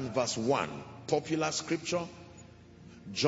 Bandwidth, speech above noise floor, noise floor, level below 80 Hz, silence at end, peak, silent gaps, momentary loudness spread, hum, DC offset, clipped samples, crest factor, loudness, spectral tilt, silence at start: 8 kHz; 21 dB; -53 dBFS; -68 dBFS; 0 s; -14 dBFS; none; 21 LU; none; under 0.1%; under 0.1%; 20 dB; -33 LUFS; -4 dB/octave; 0 s